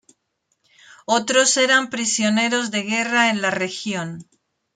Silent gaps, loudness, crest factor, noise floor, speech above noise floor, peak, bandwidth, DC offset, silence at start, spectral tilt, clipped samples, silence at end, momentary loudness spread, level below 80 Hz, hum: none; -19 LUFS; 18 dB; -72 dBFS; 52 dB; -4 dBFS; 9.6 kHz; under 0.1%; 1.1 s; -2 dB/octave; under 0.1%; 0.5 s; 12 LU; -70 dBFS; none